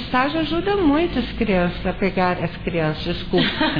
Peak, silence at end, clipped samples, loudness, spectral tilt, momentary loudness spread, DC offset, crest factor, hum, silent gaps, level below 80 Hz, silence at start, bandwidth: -6 dBFS; 0 s; under 0.1%; -21 LUFS; -8 dB/octave; 5 LU; 1%; 14 dB; none; none; -36 dBFS; 0 s; 5.2 kHz